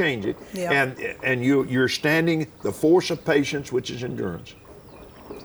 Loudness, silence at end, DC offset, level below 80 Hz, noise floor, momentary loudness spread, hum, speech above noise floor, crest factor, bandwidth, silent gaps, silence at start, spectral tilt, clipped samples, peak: -23 LUFS; 0 s; under 0.1%; -56 dBFS; -45 dBFS; 11 LU; none; 22 dB; 16 dB; over 20 kHz; none; 0 s; -5.5 dB/octave; under 0.1%; -8 dBFS